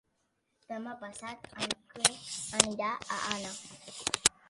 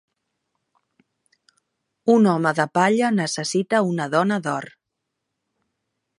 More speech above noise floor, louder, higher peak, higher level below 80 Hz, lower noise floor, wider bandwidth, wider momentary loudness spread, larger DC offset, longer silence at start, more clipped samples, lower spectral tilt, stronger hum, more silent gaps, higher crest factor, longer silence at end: second, 43 dB vs 61 dB; second, -32 LUFS vs -20 LUFS; first, 0 dBFS vs -4 dBFS; first, -64 dBFS vs -72 dBFS; about the same, -78 dBFS vs -80 dBFS; about the same, 12 kHz vs 11.5 kHz; first, 16 LU vs 10 LU; neither; second, 0.7 s vs 2.05 s; neither; second, -1 dB/octave vs -5.5 dB/octave; neither; neither; first, 34 dB vs 20 dB; second, 0.2 s vs 1.55 s